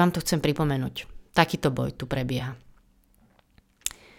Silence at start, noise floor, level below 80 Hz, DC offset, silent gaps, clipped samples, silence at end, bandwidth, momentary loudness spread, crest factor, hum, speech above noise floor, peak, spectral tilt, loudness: 0 s; -61 dBFS; -48 dBFS; under 0.1%; none; under 0.1%; 0.3 s; 17.5 kHz; 11 LU; 24 dB; none; 36 dB; -4 dBFS; -5 dB/octave; -27 LUFS